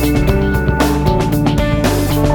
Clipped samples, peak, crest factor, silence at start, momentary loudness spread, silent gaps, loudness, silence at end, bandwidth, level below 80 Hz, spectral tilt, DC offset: under 0.1%; 0 dBFS; 12 dB; 0 s; 1 LU; none; -14 LUFS; 0 s; 19.5 kHz; -20 dBFS; -6.5 dB/octave; under 0.1%